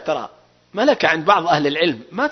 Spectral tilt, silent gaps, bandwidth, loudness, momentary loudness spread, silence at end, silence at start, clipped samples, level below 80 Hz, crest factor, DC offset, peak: -5 dB/octave; none; 6.4 kHz; -18 LUFS; 12 LU; 0 s; 0 s; under 0.1%; -62 dBFS; 18 dB; under 0.1%; -2 dBFS